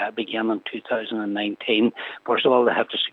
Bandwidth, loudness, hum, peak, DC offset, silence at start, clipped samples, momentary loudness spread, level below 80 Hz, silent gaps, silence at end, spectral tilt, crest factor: 5 kHz; -23 LUFS; none; -6 dBFS; under 0.1%; 0 s; under 0.1%; 9 LU; -84 dBFS; none; 0.05 s; -7 dB/octave; 18 dB